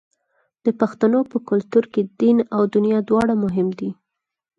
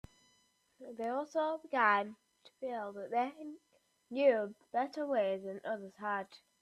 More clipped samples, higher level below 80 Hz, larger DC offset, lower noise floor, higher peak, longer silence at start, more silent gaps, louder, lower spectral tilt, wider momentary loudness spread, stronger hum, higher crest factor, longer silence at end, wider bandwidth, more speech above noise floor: neither; first, -58 dBFS vs -76 dBFS; neither; second, -68 dBFS vs -73 dBFS; first, -4 dBFS vs -16 dBFS; second, 0.65 s vs 0.8 s; neither; first, -20 LUFS vs -36 LUFS; first, -8.5 dB/octave vs -5.5 dB/octave; second, 7 LU vs 16 LU; neither; second, 16 dB vs 22 dB; first, 0.65 s vs 0.25 s; second, 7.6 kHz vs 11.5 kHz; first, 50 dB vs 38 dB